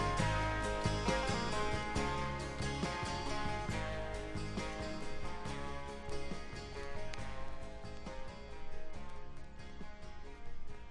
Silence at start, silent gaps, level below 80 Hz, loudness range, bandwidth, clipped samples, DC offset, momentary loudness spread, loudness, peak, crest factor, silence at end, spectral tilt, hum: 0 s; none; -46 dBFS; 12 LU; 11.5 kHz; under 0.1%; under 0.1%; 17 LU; -40 LUFS; -18 dBFS; 20 dB; 0 s; -5 dB/octave; none